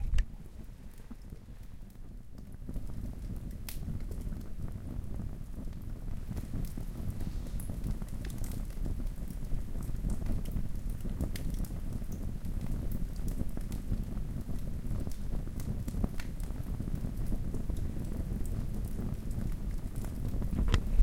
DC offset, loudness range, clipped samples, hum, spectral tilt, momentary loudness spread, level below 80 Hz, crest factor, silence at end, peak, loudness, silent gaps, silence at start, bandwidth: under 0.1%; 5 LU; under 0.1%; none; -6.5 dB/octave; 8 LU; -36 dBFS; 26 dB; 0 s; -8 dBFS; -40 LUFS; none; 0 s; 16.5 kHz